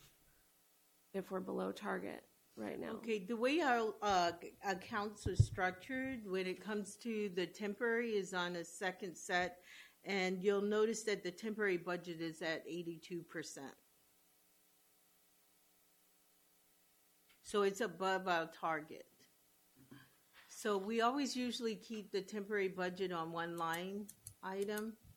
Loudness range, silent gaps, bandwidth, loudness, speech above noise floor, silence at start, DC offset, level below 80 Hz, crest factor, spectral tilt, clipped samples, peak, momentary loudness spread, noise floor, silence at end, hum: 8 LU; none; 19 kHz; -40 LUFS; 33 dB; 0.05 s; under 0.1%; -64 dBFS; 24 dB; -5 dB/octave; under 0.1%; -18 dBFS; 12 LU; -73 dBFS; 0.05 s; none